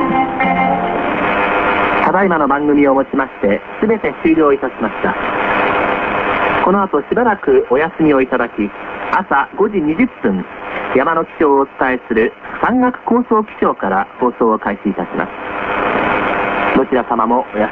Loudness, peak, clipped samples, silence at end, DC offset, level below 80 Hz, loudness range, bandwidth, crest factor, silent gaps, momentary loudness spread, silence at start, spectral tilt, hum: -15 LUFS; 0 dBFS; under 0.1%; 0 s; under 0.1%; -42 dBFS; 2 LU; 5.6 kHz; 14 dB; none; 6 LU; 0 s; -8.5 dB/octave; none